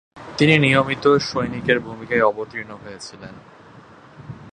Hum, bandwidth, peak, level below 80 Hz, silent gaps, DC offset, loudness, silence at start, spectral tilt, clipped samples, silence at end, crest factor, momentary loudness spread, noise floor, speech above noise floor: none; 9.6 kHz; 0 dBFS; -52 dBFS; none; under 0.1%; -18 LUFS; 0.15 s; -5.5 dB/octave; under 0.1%; 0.05 s; 20 dB; 23 LU; -45 dBFS; 25 dB